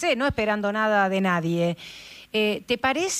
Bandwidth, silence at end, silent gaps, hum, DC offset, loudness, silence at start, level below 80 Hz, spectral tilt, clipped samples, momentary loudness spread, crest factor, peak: 15.5 kHz; 0 s; none; none; under 0.1%; -24 LUFS; 0 s; -52 dBFS; -4.5 dB/octave; under 0.1%; 10 LU; 16 dB; -8 dBFS